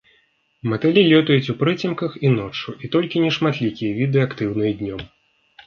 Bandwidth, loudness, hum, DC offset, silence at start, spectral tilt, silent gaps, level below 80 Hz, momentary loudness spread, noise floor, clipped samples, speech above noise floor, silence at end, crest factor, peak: 6.8 kHz; -20 LUFS; none; under 0.1%; 0.65 s; -7.5 dB/octave; none; -54 dBFS; 14 LU; -62 dBFS; under 0.1%; 43 dB; 0.6 s; 18 dB; -2 dBFS